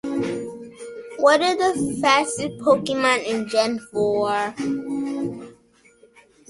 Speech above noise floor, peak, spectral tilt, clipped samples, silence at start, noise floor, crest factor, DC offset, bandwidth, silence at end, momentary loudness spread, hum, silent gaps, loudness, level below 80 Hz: 35 dB; -4 dBFS; -3.5 dB/octave; under 0.1%; 0.05 s; -55 dBFS; 18 dB; under 0.1%; 11.5 kHz; 0.95 s; 16 LU; none; none; -21 LUFS; -60 dBFS